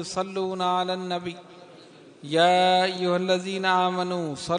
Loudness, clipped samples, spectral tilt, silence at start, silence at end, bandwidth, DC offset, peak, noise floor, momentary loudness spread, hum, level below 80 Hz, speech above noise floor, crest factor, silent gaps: -24 LUFS; under 0.1%; -4.5 dB/octave; 0 s; 0 s; 10.5 kHz; under 0.1%; -8 dBFS; -49 dBFS; 12 LU; none; -68 dBFS; 25 dB; 18 dB; none